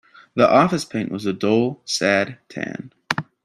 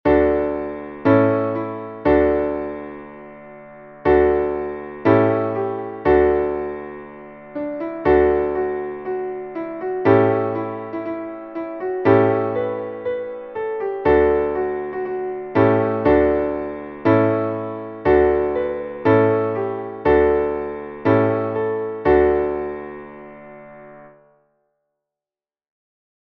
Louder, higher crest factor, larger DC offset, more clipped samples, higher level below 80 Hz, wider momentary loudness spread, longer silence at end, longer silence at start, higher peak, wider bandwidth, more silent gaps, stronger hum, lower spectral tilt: about the same, -20 LUFS vs -20 LUFS; about the same, 20 dB vs 18 dB; neither; neither; second, -60 dBFS vs -40 dBFS; about the same, 14 LU vs 16 LU; second, 0.2 s vs 2.25 s; first, 0.35 s vs 0.05 s; about the same, -2 dBFS vs -2 dBFS; first, 13.5 kHz vs 5.2 kHz; neither; neither; second, -5 dB/octave vs -10.5 dB/octave